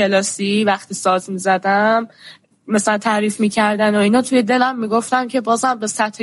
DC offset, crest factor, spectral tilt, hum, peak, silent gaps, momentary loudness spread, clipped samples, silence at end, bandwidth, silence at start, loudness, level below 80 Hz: under 0.1%; 14 dB; -4 dB/octave; none; -4 dBFS; none; 5 LU; under 0.1%; 0 s; 11.5 kHz; 0 s; -17 LUFS; -66 dBFS